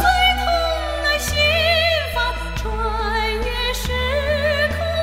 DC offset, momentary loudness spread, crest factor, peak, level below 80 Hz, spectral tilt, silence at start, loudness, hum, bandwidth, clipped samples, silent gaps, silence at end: under 0.1%; 7 LU; 16 dB; -4 dBFS; -28 dBFS; -3.5 dB/octave; 0 s; -19 LUFS; none; 16 kHz; under 0.1%; none; 0 s